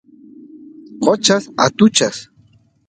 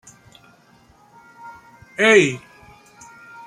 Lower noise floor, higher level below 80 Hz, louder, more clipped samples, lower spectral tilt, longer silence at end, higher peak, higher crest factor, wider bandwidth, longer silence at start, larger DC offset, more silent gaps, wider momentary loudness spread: about the same, -53 dBFS vs -53 dBFS; about the same, -60 dBFS vs -62 dBFS; about the same, -15 LUFS vs -15 LUFS; neither; about the same, -3.5 dB/octave vs -4 dB/octave; second, 0.65 s vs 1.1 s; about the same, 0 dBFS vs -2 dBFS; about the same, 18 dB vs 22 dB; second, 9.4 kHz vs 12 kHz; second, 0.95 s vs 1.45 s; neither; neither; second, 8 LU vs 28 LU